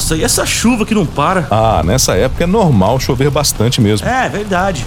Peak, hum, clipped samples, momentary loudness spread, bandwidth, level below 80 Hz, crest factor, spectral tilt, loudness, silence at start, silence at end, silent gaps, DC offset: 0 dBFS; none; under 0.1%; 4 LU; 17.5 kHz; -26 dBFS; 12 dB; -4.5 dB/octave; -12 LUFS; 0 s; 0 s; none; under 0.1%